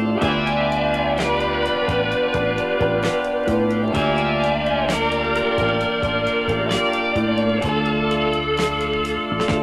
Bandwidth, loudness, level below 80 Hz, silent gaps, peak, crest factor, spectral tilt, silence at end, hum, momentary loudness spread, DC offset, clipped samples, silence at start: 13 kHz; -20 LUFS; -38 dBFS; none; -6 dBFS; 14 dB; -5.5 dB/octave; 0 s; none; 2 LU; 0.1%; under 0.1%; 0 s